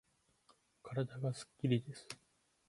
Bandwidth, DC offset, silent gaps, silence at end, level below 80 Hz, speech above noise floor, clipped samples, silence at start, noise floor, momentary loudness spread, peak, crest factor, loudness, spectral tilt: 11.5 kHz; under 0.1%; none; 0.55 s; -76 dBFS; 34 dB; under 0.1%; 0.85 s; -73 dBFS; 16 LU; -22 dBFS; 20 dB; -40 LUFS; -6.5 dB/octave